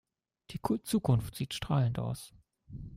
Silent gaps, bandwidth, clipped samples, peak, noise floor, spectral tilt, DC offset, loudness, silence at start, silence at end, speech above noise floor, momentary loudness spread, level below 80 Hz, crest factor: none; 16 kHz; under 0.1%; -16 dBFS; -57 dBFS; -6.5 dB/octave; under 0.1%; -33 LUFS; 0.5 s; 0 s; 25 dB; 18 LU; -54 dBFS; 18 dB